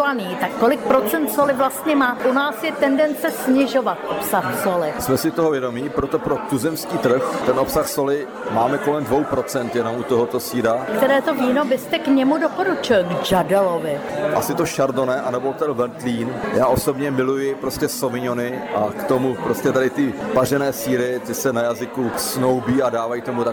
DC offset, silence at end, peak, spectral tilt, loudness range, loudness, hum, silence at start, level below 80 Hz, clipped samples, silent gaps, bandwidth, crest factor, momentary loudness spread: under 0.1%; 0 s; -6 dBFS; -5 dB/octave; 3 LU; -20 LUFS; none; 0 s; -50 dBFS; under 0.1%; none; over 20 kHz; 14 dB; 6 LU